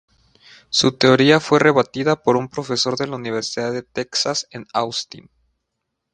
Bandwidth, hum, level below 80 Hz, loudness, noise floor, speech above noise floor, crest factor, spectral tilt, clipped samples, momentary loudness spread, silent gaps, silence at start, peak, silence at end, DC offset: 10 kHz; none; -60 dBFS; -18 LUFS; -78 dBFS; 59 dB; 20 dB; -4 dB/octave; under 0.1%; 11 LU; none; 0.7 s; 0 dBFS; 0.95 s; under 0.1%